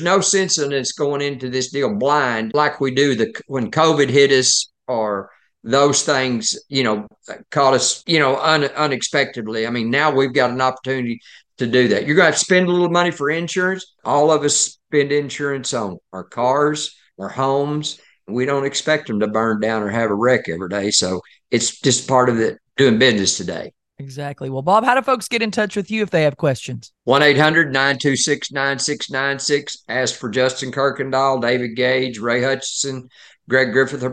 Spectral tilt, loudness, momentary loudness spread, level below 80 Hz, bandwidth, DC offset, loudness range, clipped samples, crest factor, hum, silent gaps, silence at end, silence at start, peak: -3.5 dB/octave; -18 LUFS; 11 LU; -64 dBFS; 12.5 kHz; under 0.1%; 3 LU; under 0.1%; 18 dB; none; none; 0 s; 0 s; 0 dBFS